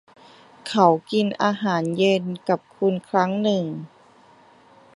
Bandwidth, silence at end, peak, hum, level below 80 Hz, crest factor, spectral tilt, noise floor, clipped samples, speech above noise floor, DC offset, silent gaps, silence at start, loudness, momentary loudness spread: 11.5 kHz; 1.1 s; -2 dBFS; none; -70 dBFS; 20 dB; -6 dB/octave; -52 dBFS; under 0.1%; 31 dB; under 0.1%; none; 0.65 s; -22 LUFS; 8 LU